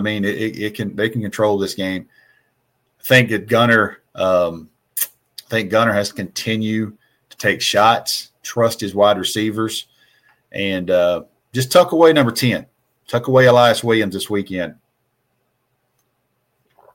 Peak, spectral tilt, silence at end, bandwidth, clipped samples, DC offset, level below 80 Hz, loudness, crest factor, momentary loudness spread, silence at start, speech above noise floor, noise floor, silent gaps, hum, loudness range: 0 dBFS; -4.5 dB/octave; 2.2 s; 17 kHz; under 0.1%; under 0.1%; -58 dBFS; -17 LUFS; 18 dB; 13 LU; 0 s; 52 dB; -68 dBFS; none; none; 5 LU